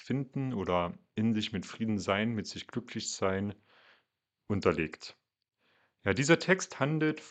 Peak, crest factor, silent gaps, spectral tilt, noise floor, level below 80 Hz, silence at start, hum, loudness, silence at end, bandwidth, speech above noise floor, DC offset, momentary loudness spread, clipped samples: -10 dBFS; 22 dB; none; -5 dB/octave; -80 dBFS; -64 dBFS; 0 s; none; -32 LUFS; 0 s; 9.2 kHz; 48 dB; under 0.1%; 12 LU; under 0.1%